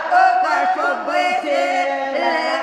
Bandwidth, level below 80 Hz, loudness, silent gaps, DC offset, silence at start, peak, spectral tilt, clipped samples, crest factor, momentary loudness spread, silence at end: 11.5 kHz; -66 dBFS; -18 LUFS; none; under 0.1%; 0 s; -2 dBFS; -1.5 dB/octave; under 0.1%; 14 dB; 5 LU; 0 s